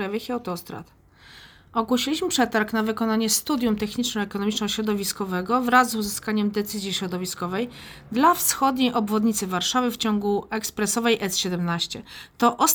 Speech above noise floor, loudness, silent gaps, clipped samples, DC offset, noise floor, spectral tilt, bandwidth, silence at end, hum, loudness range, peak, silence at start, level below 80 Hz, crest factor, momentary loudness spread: 25 dB; -24 LUFS; none; under 0.1%; under 0.1%; -49 dBFS; -3.5 dB/octave; over 20 kHz; 0 s; none; 2 LU; -4 dBFS; 0 s; -56 dBFS; 20 dB; 10 LU